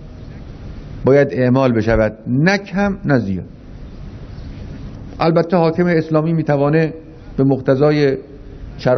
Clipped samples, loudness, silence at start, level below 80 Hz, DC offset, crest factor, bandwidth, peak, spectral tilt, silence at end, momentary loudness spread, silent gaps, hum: under 0.1%; -16 LUFS; 0 s; -36 dBFS; under 0.1%; 16 dB; 6.4 kHz; -2 dBFS; -8 dB/octave; 0 s; 21 LU; none; none